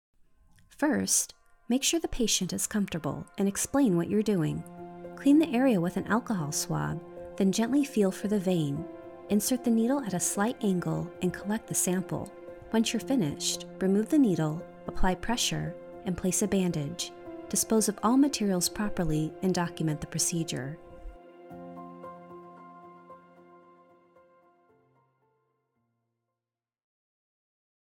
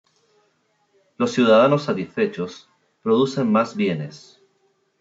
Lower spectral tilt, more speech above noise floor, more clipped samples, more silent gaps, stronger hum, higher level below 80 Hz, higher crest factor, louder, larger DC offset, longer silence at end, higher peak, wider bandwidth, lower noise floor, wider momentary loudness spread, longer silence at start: about the same, -4.5 dB/octave vs -5 dB/octave; first, over 62 dB vs 47 dB; neither; neither; neither; first, -48 dBFS vs -72 dBFS; about the same, 18 dB vs 18 dB; second, -28 LUFS vs -20 LUFS; neither; first, 4.7 s vs 0.8 s; second, -12 dBFS vs -4 dBFS; first, 18.5 kHz vs 7.8 kHz; first, under -90 dBFS vs -66 dBFS; first, 19 LU vs 15 LU; second, 0.8 s vs 1.2 s